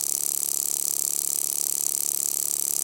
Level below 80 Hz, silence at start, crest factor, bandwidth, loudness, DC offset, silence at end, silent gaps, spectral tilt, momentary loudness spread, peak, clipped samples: -76 dBFS; 0 s; 24 dB; 17.5 kHz; -23 LUFS; under 0.1%; 0 s; none; 1 dB/octave; 0 LU; -2 dBFS; under 0.1%